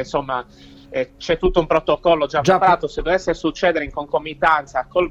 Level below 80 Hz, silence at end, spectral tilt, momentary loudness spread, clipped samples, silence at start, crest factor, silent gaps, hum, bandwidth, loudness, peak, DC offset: -38 dBFS; 0 s; -5.5 dB/octave; 10 LU; under 0.1%; 0 s; 16 dB; none; none; 9.6 kHz; -19 LUFS; -4 dBFS; under 0.1%